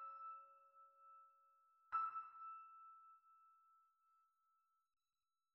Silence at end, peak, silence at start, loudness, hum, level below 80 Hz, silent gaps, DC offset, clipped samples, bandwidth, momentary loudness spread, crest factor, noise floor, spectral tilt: 1.7 s; -34 dBFS; 0 s; -50 LUFS; none; under -90 dBFS; none; under 0.1%; under 0.1%; 5.4 kHz; 23 LU; 22 dB; under -90 dBFS; 0.5 dB/octave